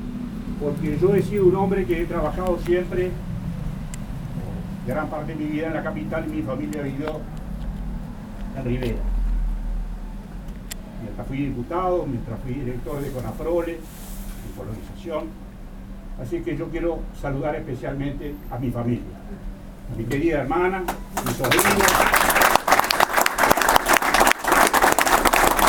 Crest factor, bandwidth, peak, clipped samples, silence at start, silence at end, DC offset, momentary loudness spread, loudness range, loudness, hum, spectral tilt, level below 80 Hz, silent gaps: 22 dB; 18 kHz; 0 dBFS; under 0.1%; 0 s; 0 s; under 0.1%; 19 LU; 13 LU; -22 LUFS; none; -4 dB/octave; -34 dBFS; none